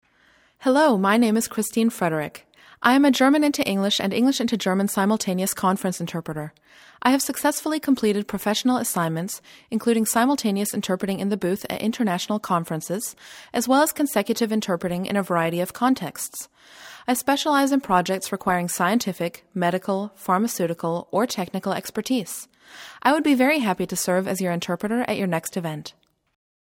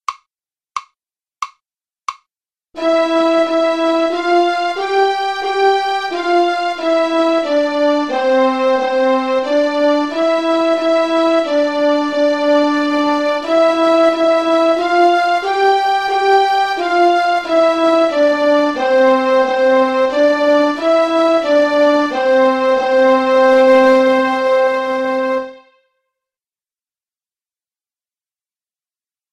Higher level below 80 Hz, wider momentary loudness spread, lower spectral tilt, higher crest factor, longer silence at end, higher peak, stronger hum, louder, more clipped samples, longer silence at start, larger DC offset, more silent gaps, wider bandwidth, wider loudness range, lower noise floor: about the same, -62 dBFS vs -58 dBFS; first, 11 LU vs 6 LU; about the same, -4.5 dB/octave vs -3.5 dB/octave; first, 20 dB vs 12 dB; second, 0.9 s vs 3.75 s; about the same, -2 dBFS vs -2 dBFS; neither; second, -23 LUFS vs -14 LUFS; neither; first, 0.6 s vs 0.1 s; second, under 0.1% vs 0.2%; neither; first, 18 kHz vs 11.5 kHz; about the same, 4 LU vs 5 LU; second, -59 dBFS vs under -90 dBFS